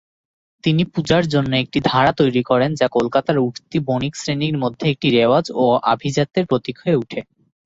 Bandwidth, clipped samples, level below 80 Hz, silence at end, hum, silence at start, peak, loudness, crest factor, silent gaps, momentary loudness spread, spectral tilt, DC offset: 7.8 kHz; under 0.1%; -52 dBFS; 0.45 s; none; 0.65 s; -2 dBFS; -18 LUFS; 16 dB; none; 6 LU; -6 dB/octave; under 0.1%